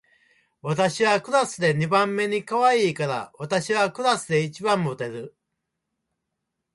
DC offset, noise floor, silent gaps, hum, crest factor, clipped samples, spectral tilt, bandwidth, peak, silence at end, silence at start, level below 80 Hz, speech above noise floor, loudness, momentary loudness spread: under 0.1%; -81 dBFS; none; none; 18 dB; under 0.1%; -4.5 dB/octave; 11.5 kHz; -6 dBFS; 1.45 s; 0.65 s; -68 dBFS; 58 dB; -23 LUFS; 11 LU